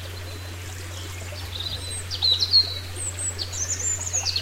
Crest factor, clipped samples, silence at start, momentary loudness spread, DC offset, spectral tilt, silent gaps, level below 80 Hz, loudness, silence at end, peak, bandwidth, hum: 20 dB; under 0.1%; 0 s; 18 LU; under 0.1%; -1 dB/octave; none; -46 dBFS; -23 LUFS; 0 s; -8 dBFS; 16 kHz; none